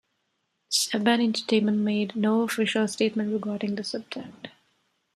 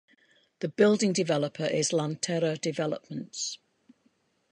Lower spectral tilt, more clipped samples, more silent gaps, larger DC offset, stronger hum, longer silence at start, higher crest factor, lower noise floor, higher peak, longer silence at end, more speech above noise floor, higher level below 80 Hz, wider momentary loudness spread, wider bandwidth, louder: about the same, -4 dB/octave vs -4.5 dB/octave; neither; neither; neither; neither; about the same, 0.7 s vs 0.6 s; about the same, 18 dB vs 20 dB; first, -76 dBFS vs -70 dBFS; about the same, -10 dBFS vs -8 dBFS; second, 0.7 s vs 0.95 s; first, 51 dB vs 43 dB; about the same, -74 dBFS vs -76 dBFS; about the same, 15 LU vs 13 LU; first, 14 kHz vs 11 kHz; first, -25 LUFS vs -28 LUFS